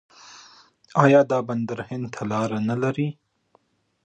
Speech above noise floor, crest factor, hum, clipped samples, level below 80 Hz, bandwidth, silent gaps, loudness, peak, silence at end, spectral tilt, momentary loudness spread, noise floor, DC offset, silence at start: 42 dB; 22 dB; none; under 0.1%; -66 dBFS; 9 kHz; none; -23 LUFS; -2 dBFS; 0.95 s; -7.5 dB/octave; 13 LU; -64 dBFS; under 0.1%; 0.25 s